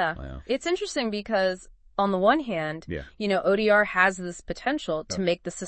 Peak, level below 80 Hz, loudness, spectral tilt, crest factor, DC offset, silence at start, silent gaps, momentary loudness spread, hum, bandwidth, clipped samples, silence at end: -6 dBFS; -50 dBFS; -25 LUFS; -4.5 dB/octave; 20 dB; under 0.1%; 0 s; none; 14 LU; none; 8.8 kHz; under 0.1%; 0 s